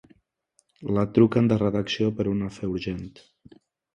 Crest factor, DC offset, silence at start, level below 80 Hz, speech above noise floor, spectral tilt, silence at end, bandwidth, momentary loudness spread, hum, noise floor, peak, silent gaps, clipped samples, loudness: 20 dB; under 0.1%; 0.8 s; -52 dBFS; 45 dB; -7.5 dB/octave; 0.85 s; 9.4 kHz; 15 LU; none; -69 dBFS; -6 dBFS; none; under 0.1%; -24 LUFS